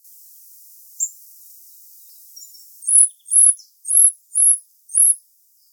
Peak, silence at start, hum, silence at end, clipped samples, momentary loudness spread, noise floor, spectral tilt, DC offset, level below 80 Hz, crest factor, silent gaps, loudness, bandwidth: 0 dBFS; 1 s; none; 0.55 s; under 0.1%; 14 LU; -57 dBFS; 10.5 dB/octave; under 0.1%; under -90 dBFS; 20 dB; none; -14 LUFS; over 20 kHz